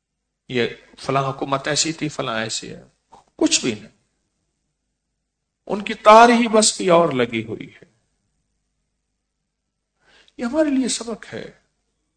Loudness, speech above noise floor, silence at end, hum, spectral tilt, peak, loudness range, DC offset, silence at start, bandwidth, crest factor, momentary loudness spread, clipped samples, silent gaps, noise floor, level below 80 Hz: -18 LUFS; 58 dB; 0.65 s; 50 Hz at -60 dBFS; -3.5 dB/octave; 0 dBFS; 10 LU; under 0.1%; 0.5 s; 11 kHz; 22 dB; 20 LU; under 0.1%; none; -77 dBFS; -58 dBFS